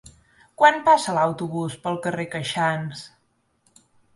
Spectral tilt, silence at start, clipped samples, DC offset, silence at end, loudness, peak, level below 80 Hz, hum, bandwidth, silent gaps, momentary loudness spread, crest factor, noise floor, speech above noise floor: -4.5 dB/octave; 0.6 s; under 0.1%; under 0.1%; 1.1 s; -22 LUFS; -2 dBFS; -62 dBFS; none; 11.5 kHz; none; 12 LU; 22 dB; -68 dBFS; 46 dB